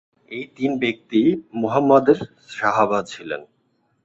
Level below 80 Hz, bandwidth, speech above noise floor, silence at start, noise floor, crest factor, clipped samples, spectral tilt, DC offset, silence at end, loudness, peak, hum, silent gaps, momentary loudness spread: -62 dBFS; 8 kHz; 46 dB; 0.3 s; -66 dBFS; 18 dB; under 0.1%; -6.5 dB/octave; under 0.1%; 0.6 s; -20 LUFS; -2 dBFS; none; none; 17 LU